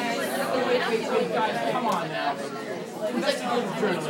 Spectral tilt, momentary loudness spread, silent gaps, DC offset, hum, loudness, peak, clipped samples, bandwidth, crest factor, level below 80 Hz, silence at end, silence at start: -4.5 dB/octave; 7 LU; none; under 0.1%; none; -26 LUFS; -12 dBFS; under 0.1%; 18 kHz; 16 dB; -80 dBFS; 0 s; 0 s